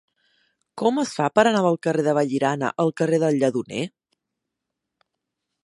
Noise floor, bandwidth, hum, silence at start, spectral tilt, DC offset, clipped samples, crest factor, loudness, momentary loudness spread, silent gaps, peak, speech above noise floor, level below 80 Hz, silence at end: -82 dBFS; 11.5 kHz; none; 0.75 s; -6 dB/octave; under 0.1%; under 0.1%; 22 dB; -22 LUFS; 8 LU; none; -2 dBFS; 62 dB; -70 dBFS; 1.75 s